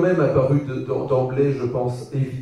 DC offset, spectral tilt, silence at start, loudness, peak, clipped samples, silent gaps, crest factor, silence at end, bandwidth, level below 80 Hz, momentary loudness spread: under 0.1%; -9 dB/octave; 0 s; -21 LUFS; -6 dBFS; under 0.1%; none; 14 dB; 0 s; 10.5 kHz; -50 dBFS; 8 LU